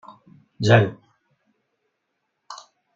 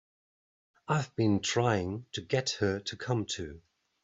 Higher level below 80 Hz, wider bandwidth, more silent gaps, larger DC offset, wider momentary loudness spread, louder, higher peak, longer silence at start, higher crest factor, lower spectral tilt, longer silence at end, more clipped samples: first, -58 dBFS vs -64 dBFS; about the same, 7.6 kHz vs 8 kHz; neither; neither; first, 24 LU vs 10 LU; first, -19 LUFS vs -31 LUFS; first, -2 dBFS vs -12 dBFS; second, 0.6 s vs 0.9 s; about the same, 22 dB vs 20 dB; first, -6.5 dB/octave vs -5 dB/octave; about the same, 0.4 s vs 0.45 s; neither